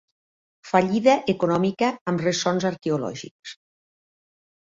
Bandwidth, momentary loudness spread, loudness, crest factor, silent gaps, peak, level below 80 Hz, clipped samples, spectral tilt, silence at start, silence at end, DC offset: 7.8 kHz; 17 LU; -23 LUFS; 20 dB; 2.01-2.06 s, 3.31-3.43 s; -4 dBFS; -64 dBFS; under 0.1%; -5.5 dB/octave; 0.65 s; 1.15 s; under 0.1%